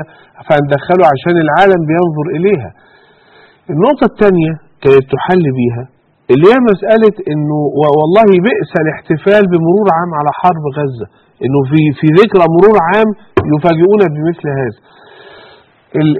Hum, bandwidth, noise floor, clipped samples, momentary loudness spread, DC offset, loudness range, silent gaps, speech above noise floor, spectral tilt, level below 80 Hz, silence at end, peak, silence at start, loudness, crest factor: none; 5.8 kHz; -44 dBFS; 0.7%; 10 LU; under 0.1%; 3 LU; none; 34 dB; -9 dB/octave; -44 dBFS; 0 s; 0 dBFS; 0 s; -10 LUFS; 10 dB